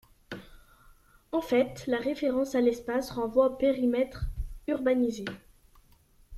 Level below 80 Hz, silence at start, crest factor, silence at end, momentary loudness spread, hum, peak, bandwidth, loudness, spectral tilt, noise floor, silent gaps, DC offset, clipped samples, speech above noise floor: -46 dBFS; 0.3 s; 18 dB; 0 s; 16 LU; none; -12 dBFS; 14 kHz; -29 LUFS; -6 dB/octave; -61 dBFS; none; under 0.1%; under 0.1%; 33 dB